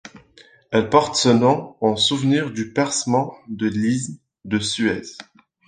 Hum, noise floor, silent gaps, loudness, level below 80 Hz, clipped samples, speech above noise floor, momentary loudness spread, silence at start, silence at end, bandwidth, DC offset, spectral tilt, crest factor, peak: none; -51 dBFS; none; -20 LUFS; -54 dBFS; under 0.1%; 32 dB; 13 LU; 0.05 s; 0.45 s; 10 kHz; under 0.1%; -4.5 dB/octave; 20 dB; -2 dBFS